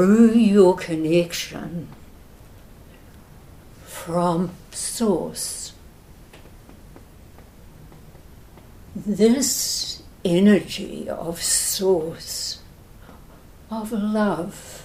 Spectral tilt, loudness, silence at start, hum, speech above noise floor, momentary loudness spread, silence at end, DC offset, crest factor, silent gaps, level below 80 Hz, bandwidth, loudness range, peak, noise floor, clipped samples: -4.5 dB/octave; -21 LUFS; 0 s; none; 25 dB; 18 LU; 0 s; under 0.1%; 20 dB; none; -48 dBFS; 16 kHz; 9 LU; -4 dBFS; -46 dBFS; under 0.1%